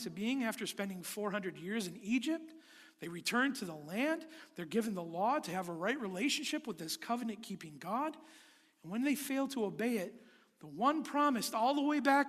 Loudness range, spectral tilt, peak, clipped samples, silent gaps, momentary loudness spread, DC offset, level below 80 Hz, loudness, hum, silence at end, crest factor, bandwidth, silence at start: 4 LU; -4 dB/octave; -16 dBFS; under 0.1%; none; 13 LU; under 0.1%; -82 dBFS; -36 LUFS; none; 0 s; 22 dB; 14.5 kHz; 0 s